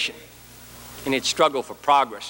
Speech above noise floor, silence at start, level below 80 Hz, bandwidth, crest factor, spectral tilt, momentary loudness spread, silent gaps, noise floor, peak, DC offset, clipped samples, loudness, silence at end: 24 dB; 0 s; -56 dBFS; 17 kHz; 20 dB; -2.5 dB/octave; 23 LU; none; -45 dBFS; -4 dBFS; under 0.1%; under 0.1%; -22 LUFS; 0 s